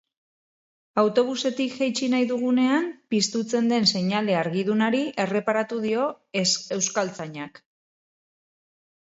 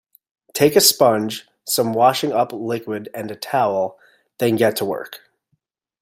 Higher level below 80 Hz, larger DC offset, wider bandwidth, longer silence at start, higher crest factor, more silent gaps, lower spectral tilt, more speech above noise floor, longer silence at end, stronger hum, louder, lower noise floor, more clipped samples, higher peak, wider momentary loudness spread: second, -72 dBFS vs -64 dBFS; neither; second, 8 kHz vs 16.5 kHz; first, 0.95 s vs 0.55 s; about the same, 18 dB vs 20 dB; neither; about the same, -4 dB/octave vs -3.5 dB/octave; first, over 66 dB vs 52 dB; first, 1.55 s vs 0.85 s; neither; second, -24 LUFS vs -18 LUFS; first, under -90 dBFS vs -70 dBFS; neither; second, -6 dBFS vs 0 dBFS; second, 6 LU vs 16 LU